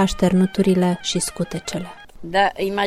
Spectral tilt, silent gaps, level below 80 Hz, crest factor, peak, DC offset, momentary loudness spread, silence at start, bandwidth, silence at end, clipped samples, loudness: -5 dB/octave; none; -42 dBFS; 16 dB; -4 dBFS; under 0.1%; 12 LU; 0 s; 15 kHz; 0 s; under 0.1%; -20 LUFS